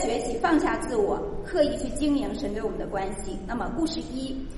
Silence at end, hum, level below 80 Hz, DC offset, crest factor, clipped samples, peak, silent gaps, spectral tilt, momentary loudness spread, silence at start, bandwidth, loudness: 0 s; none; -40 dBFS; under 0.1%; 18 dB; under 0.1%; -10 dBFS; none; -5 dB/octave; 9 LU; 0 s; 11.5 kHz; -28 LUFS